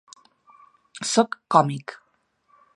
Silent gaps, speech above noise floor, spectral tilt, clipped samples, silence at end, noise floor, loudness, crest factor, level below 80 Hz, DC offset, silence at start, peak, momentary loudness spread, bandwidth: none; 46 dB; -4.5 dB/octave; under 0.1%; 0.8 s; -67 dBFS; -22 LUFS; 24 dB; -76 dBFS; under 0.1%; 0.95 s; -2 dBFS; 19 LU; 11.5 kHz